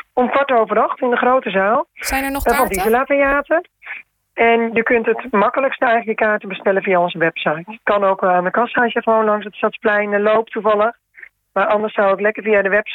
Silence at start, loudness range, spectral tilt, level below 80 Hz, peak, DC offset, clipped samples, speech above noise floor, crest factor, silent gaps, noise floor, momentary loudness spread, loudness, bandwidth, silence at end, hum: 0.15 s; 1 LU; -4.5 dB/octave; -44 dBFS; -4 dBFS; under 0.1%; under 0.1%; 27 dB; 14 dB; none; -44 dBFS; 5 LU; -16 LUFS; 19 kHz; 0 s; none